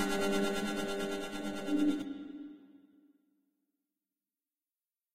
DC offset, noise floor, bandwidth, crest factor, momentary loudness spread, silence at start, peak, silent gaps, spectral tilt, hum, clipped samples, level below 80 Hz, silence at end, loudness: under 0.1%; under -90 dBFS; 16 kHz; 18 dB; 14 LU; 0 s; -20 dBFS; none; -4.5 dB/octave; none; under 0.1%; -62 dBFS; 0 s; -35 LUFS